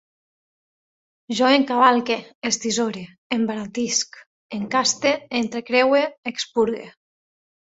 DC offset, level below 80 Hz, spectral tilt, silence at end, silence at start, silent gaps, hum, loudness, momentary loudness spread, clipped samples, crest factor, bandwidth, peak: under 0.1%; -66 dBFS; -2.5 dB/octave; 0.85 s; 1.3 s; 2.35-2.42 s, 3.18-3.30 s, 4.27-4.49 s, 6.18-6.23 s; none; -21 LUFS; 12 LU; under 0.1%; 20 dB; 8 kHz; -2 dBFS